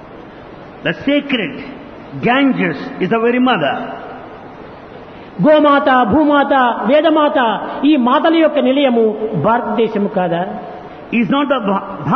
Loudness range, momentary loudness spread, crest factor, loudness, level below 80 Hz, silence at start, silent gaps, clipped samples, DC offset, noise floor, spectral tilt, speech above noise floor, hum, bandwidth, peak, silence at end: 5 LU; 22 LU; 12 dB; -14 LUFS; -50 dBFS; 0 s; none; under 0.1%; under 0.1%; -34 dBFS; -8.5 dB/octave; 21 dB; none; 6 kHz; -2 dBFS; 0 s